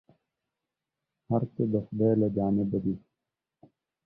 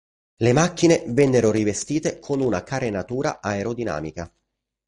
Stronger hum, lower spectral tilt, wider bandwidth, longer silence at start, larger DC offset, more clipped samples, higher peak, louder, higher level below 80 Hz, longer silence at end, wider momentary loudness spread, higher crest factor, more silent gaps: neither; first, -13.5 dB/octave vs -5.5 dB/octave; second, 2.8 kHz vs 11.5 kHz; first, 1.3 s vs 0.4 s; neither; neither; second, -12 dBFS vs -4 dBFS; second, -28 LUFS vs -22 LUFS; second, -60 dBFS vs -52 dBFS; first, 1.1 s vs 0.6 s; second, 7 LU vs 10 LU; about the same, 18 dB vs 18 dB; neither